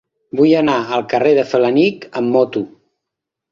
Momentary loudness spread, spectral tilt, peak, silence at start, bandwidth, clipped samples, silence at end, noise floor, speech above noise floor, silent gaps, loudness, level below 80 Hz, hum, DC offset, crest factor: 10 LU; -6.5 dB/octave; -2 dBFS; 0.35 s; 7.2 kHz; under 0.1%; 0.85 s; -81 dBFS; 67 dB; none; -15 LUFS; -60 dBFS; none; under 0.1%; 14 dB